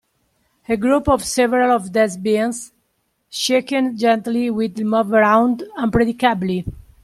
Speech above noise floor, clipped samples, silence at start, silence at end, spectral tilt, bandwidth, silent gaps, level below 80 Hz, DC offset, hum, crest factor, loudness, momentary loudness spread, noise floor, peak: 51 dB; under 0.1%; 0.7 s; 0.25 s; -4.5 dB/octave; 14 kHz; none; -44 dBFS; under 0.1%; none; 16 dB; -18 LUFS; 9 LU; -68 dBFS; -2 dBFS